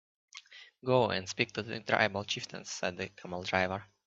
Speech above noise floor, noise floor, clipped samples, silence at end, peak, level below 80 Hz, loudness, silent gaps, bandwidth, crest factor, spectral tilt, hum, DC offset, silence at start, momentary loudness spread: 20 dB; -53 dBFS; under 0.1%; 0.2 s; -10 dBFS; -72 dBFS; -33 LUFS; none; 8 kHz; 26 dB; -4 dB/octave; none; under 0.1%; 0.35 s; 21 LU